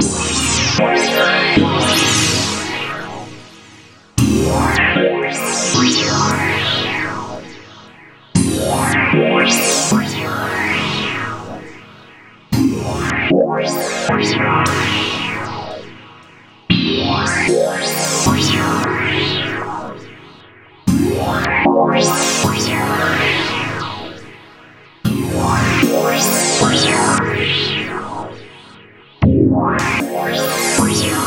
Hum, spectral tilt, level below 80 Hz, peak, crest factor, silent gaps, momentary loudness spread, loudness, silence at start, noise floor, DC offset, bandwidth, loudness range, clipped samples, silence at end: none; -3.5 dB/octave; -38 dBFS; 0 dBFS; 16 dB; none; 13 LU; -15 LUFS; 0 s; -43 dBFS; under 0.1%; 16 kHz; 3 LU; under 0.1%; 0 s